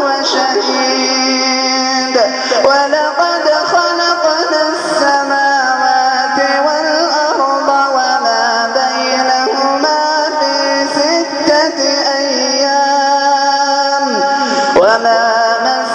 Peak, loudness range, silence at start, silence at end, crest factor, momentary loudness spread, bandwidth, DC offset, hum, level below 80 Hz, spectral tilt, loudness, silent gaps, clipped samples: 0 dBFS; 1 LU; 0 s; 0 s; 12 dB; 2 LU; 10 kHz; under 0.1%; none; -58 dBFS; -1 dB/octave; -12 LUFS; none; under 0.1%